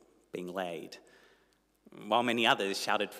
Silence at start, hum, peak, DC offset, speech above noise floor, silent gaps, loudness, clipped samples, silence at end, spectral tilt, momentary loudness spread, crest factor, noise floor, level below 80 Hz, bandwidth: 0.35 s; 50 Hz at -80 dBFS; -12 dBFS; under 0.1%; 38 dB; none; -31 LUFS; under 0.1%; 0 s; -3 dB/octave; 22 LU; 22 dB; -70 dBFS; -80 dBFS; 16 kHz